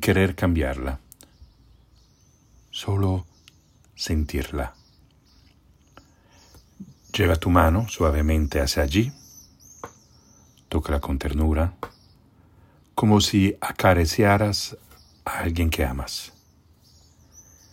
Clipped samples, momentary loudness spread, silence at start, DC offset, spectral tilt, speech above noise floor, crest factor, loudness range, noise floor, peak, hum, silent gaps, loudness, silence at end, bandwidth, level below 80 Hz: under 0.1%; 17 LU; 0 s; under 0.1%; -5.5 dB/octave; 36 dB; 22 dB; 10 LU; -58 dBFS; -4 dBFS; none; none; -23 LUFS; 1.45 s; 16.5 kHz; -36 dBFS